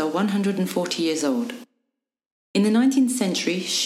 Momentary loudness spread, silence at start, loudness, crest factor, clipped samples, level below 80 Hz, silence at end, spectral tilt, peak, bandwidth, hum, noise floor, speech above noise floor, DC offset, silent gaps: 9 LU; 0 s; -22 LUFS; 14 dB; under 0.1%; -72 dBFS; 0 s; -4.5 dB/octave; -8 dBFS; 15.5 kHz; none; -81 dBFS; 59 dB; under 0.1%; 2.26-2.54 s